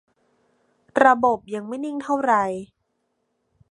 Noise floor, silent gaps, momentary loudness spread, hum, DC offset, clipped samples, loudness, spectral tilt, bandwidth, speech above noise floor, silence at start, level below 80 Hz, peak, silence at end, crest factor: -73 dBFS; none; 13 LU; none; under 0.1%; under 0.1%; -21 LUFS; -5.5 dB/octave; 11 kHz; 53 dB; 0.95 s; -66 dBFS; 0 dBFS; 1.05 s; 24 dB